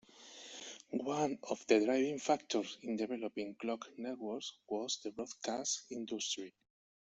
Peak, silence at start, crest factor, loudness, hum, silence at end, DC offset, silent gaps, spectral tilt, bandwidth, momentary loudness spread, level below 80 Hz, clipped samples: -14 dBFS; 0.15 s; 24 dB; -38 LUFS; none; 0.55 s; under 0.1%; none; -3 dB/octave; 8.2 kHz; 14 LU; -80 dBFS; under 0.1%